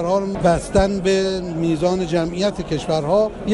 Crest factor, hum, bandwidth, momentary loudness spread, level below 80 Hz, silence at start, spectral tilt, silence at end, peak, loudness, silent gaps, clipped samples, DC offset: 14 dB; none; 11.5 kHz; 5 LU; -36 dBFS; 0 s; -6 dB/octave; 0 s; -4 dBFS; -19 LUFS; none; under 0.1%; under 0.1%